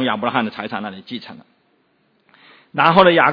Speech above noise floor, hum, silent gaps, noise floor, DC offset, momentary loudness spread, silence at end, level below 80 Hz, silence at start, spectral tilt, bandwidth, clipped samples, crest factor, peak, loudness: 45 dB; none; none; -62 dBFS; under 0.1%; 20 LU; 0 s; -58 dBFS; 0 s; -7.5 dB/octave; 5.4 kHz; under 0.1%; 18 dB; 0 dBFS; -17 LUFS